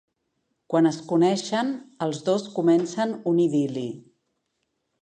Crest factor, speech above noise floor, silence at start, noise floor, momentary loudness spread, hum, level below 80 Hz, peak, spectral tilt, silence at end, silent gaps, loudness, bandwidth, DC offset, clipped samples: 16 dB; 53 dB; 0.7 s; -77 dBFS; 8 LU; none; -76 dBFS; -8 dBFS; -6 dB/octave; 1.05 s; none; -24 LUFS; 9.6 kHz; under 0.1%; under 0.1%